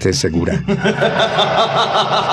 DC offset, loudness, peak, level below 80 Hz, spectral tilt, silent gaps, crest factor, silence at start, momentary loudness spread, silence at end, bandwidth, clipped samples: under 0.1%; -15 LUFS; -2 dBFS; -40 dBFS; -4.5 dB/octave; none; 12 dB; 0 s; 3 LU; 0 s; 13.5 kHz; under 0.1%